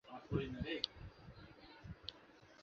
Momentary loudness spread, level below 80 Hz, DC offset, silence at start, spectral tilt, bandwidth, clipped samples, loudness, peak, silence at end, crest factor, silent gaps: 17 LU; -60 dBFS; under 0.1%; 0.05 s; -4 dB/octave; 7.4 kHz; under 0.1%; -45 LUFS; -18 dBFS; 0 s; 30 dB; none